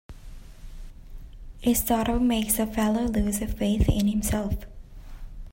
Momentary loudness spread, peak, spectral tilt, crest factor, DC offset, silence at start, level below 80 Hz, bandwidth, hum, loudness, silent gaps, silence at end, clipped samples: 11 LU; -8 dBFS; -5 dB/octave; 20 dB; under 0.1%; 0.1 s; -36 dBFS; 16.5 kHz; none; -25 LUFS; none; 0.05 s; under 0.1%